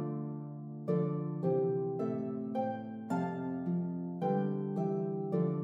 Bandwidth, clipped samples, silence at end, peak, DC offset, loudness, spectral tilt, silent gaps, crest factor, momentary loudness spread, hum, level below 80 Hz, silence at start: 7.6 kHz; under 0.1%; 0 s; -20 dBFS; under 0.1%; -35 LUFS; -10.5 dB/octave; none; 16 dB; 7 LU; none; -80 dBFS; 0 s